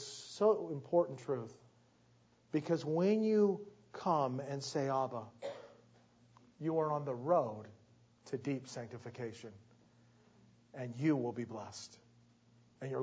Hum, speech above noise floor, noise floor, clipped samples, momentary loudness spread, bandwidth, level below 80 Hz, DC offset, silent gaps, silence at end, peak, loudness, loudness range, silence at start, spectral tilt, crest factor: none; 33 dB; -69 dBFS; under 0.1%; 17 LU; 8 kHz; -80 dBFS; under 0.1%; none; 0 s; -18 dBFS; -37 LUFS; 7 LU; 0 s; -6.5 dB/octave; 20 dB